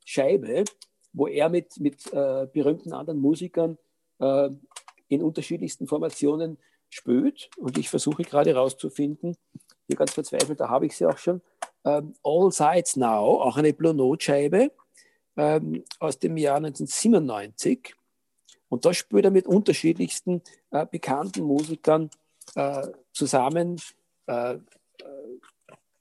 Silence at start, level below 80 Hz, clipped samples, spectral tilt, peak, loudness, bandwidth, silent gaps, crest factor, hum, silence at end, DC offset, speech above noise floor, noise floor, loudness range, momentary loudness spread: 0.05 s; -76 dBFS; under 0.1%; -5.5 dB/octave; -6 dBFS; -25 LUFS; 12.5 kHz; none; 18 dB; none; 0.65 s; under 0.1%; 47 dB; -71 dBFS; 5 LU; 13 LU